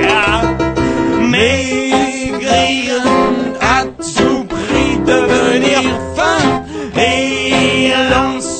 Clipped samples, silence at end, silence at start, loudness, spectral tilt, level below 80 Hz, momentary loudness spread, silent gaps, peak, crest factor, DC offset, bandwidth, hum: under 0.1%; 0 s; 0 s; -13 LUFS; -4 dB/octave; -32 dBFS; 4 LU; none; 0 dBFS; 12 dB; under 0.1%; 9.2 kHz; none